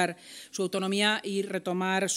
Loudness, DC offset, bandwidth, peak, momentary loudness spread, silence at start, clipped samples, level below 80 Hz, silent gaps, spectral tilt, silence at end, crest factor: -29 LUFS; under 0.1%; 15.5 kHz; -10 dBFS; 10 LU; 0 s; under 0.1%; -84 dBFS; none; -3.5 dB/octave; 0 s; 20 dB